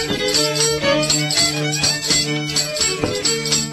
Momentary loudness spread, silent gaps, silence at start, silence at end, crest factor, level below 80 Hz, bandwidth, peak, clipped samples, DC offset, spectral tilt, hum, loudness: 3 LU; none; 0 s; 0 s; 16 dB; -44 dBFS; 14 kHz; -4 dBFS; under 0.1%; under 0.1%; -2 dB/octave; none; -16 LUFS